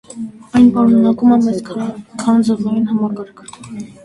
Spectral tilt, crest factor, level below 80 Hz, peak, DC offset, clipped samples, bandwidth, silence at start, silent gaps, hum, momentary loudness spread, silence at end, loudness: -7 dB/octave; 14 dB; -50 dBFS; 0 dBFS; under 0.1%; under 0.1%; 11 kHz; 0.15 s; none; none; 19 LU; 0.2 s; -14 LUFS